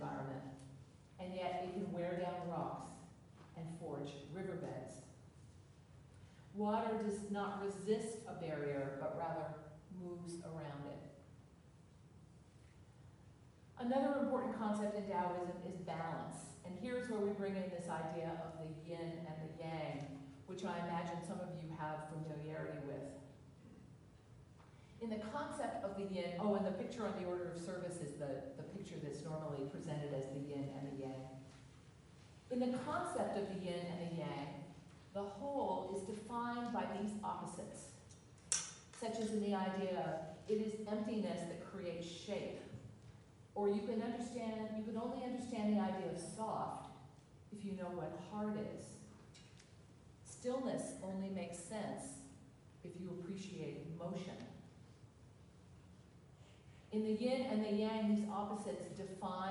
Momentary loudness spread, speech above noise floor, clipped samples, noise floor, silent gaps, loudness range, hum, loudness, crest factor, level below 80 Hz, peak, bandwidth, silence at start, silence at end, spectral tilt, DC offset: 23 LU; 21 dB; under 0.1%; -63 dBFS; none; 8 LU; none; -44 LUFS; 26 dB; -74 dBFS; -18 dBFS; 11.5 kHz; 0 s; 0 s; -5.5 dB/octave; under 0.1%